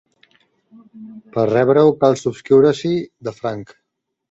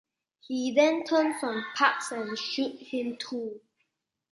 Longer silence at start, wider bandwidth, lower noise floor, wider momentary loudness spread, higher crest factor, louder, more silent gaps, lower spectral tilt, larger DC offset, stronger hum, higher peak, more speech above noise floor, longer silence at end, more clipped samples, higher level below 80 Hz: first, 0.95 s vs 0.5 s; second, 8 kHz vs 11.5 kHz; second, -57 dBFS vs -78 dBFS; about the same, 14 LU vs 12 LU; second, 16 dB vs 22 dB; first, -16 LUFS vs -28 LUFS; neither; first, -7 dB/octave vs -3 dB/octave; neither; neither; first, -2 dBFS vs -8 dBFS; second, 41 dB vs 50 dB; about the same, 0.65 s vs 0.75 s; neither; first, -58 dBFS vs -80 dBFS